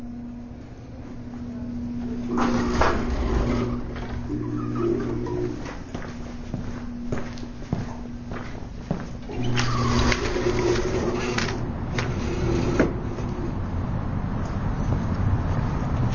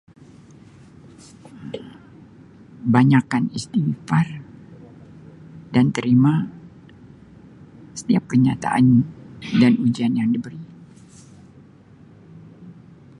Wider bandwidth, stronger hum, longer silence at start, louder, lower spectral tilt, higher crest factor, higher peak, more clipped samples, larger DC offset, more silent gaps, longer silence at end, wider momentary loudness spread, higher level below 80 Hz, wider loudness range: second, 7.2 kHz vs 11 kHz; neither; second, 0 s vs 1.55 s; second, -27 LUFS vs -19 LUFS; about the same, -6.5 dB/octave vs -7 dB/octave; about the same, 18 dB vs 22 dB; second, -6 dBFS vs 0 dBFS; neither; neither; neither; second, 0 s vs 0.45 s; second, 13 LU vs 22 LU; first, -32 dBFS vs -56 dBFS; first, 8 LU vs 4 LU